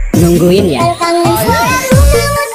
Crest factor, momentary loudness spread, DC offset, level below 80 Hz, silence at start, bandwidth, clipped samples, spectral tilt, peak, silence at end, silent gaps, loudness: 8 dB; 3 LU; under 0.1%; -18 dBFS; 0 s; 16 kHz; under 0.1%; -5.5 dB/octave; 0 dBFS; 0 s; none; -9 LUFS